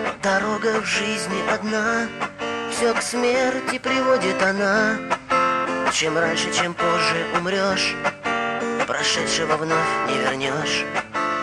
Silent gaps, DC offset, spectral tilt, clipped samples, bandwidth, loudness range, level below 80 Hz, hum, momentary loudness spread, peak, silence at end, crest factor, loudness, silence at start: none; under 0.1%; -3 dB/octave; under 0.1%; 12.5 kHz; 2 LU; -56 dBFS; none; 5 LU; -6 dBFS; 0 s; 16 dB; -21 LUFS; 0 s